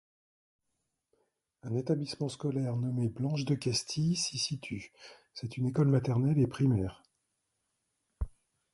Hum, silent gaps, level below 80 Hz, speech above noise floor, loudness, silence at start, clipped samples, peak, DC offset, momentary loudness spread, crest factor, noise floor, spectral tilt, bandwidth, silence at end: none; none; -52 dBFS; 52 dB; -32 LUFS; 1.65 s; under 0.1%; -16 dBFS; under 0.1%; 15 LU; 18 dB; -83 dBFS; -6 dB/octave; 11.5 kHz; 0.45 s